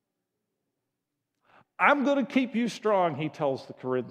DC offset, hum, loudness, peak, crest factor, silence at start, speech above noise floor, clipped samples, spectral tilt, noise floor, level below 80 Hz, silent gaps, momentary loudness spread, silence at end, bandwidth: under 0.1%; none; -27 LUFS; -6 dBFS; 22 dB; 1.8 s; 58 dB; under 0.1%; -6 dB/octave; -84 dBFS; -84 dBFS; none; 9 LU; 0 s; 11.5 kHz